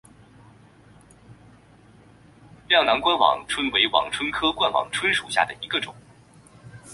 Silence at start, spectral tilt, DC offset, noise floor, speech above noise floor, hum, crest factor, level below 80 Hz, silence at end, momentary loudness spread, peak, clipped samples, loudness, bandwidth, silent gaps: 1.3 s; -2.5 dB/octave; under 0.1%; -52 dBFS; 30 dB; none; 22 dB; -56 dBFS; 0 s; 8 LU; -4 dBFS; under 0.1%; -21 LUFS; 11.5 kHz; none